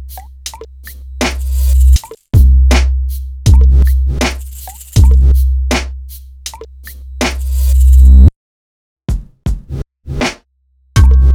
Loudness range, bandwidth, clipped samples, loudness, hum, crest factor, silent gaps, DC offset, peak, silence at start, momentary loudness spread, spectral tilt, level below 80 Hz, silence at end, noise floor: 3 LU; 16 kHz; 0.6%; -12 LUFS; none; 10 dB; 8.36-8.97 s; under 0.1%; 0 dBFS; 0 s; 21 LU; -5.5 dB/octave; -12 dBFS; 0 s; -55 dBFS